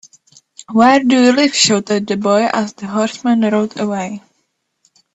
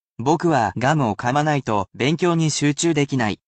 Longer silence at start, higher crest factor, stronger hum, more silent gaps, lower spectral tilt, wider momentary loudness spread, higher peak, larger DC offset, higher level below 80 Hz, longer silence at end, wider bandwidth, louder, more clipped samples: first, 0.6 s vs 0.2 s; about the same, 16 dB vs 14 dB; neither; neither; second, -3.5 dB/octave vs -5 dB/octave; first, 10 LU vs 3 LU; first, 0 dBFS vs -6 dBFS; neither; second, -60 dBFS vs -54 dBFS; first, 0.95 s vs 0.15 s; about the same, 8.4 kHz vs 9 kHz; first, -14 LUFS vs -20 LUFS; neither